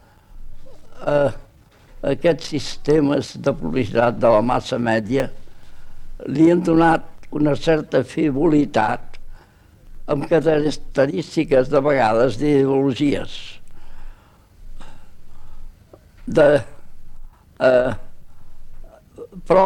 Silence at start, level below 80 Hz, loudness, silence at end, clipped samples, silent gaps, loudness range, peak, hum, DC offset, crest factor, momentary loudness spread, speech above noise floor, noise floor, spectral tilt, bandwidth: 0.3 s; -36 dBFS; -19 LUFS; 0 s; under 0.1%; none; 5 LU; -2 dBFS; none; under 0.1%; 16 dB; 13 LU; 31 dB; -49 dBFS; -7 dB/octave; 12 kHz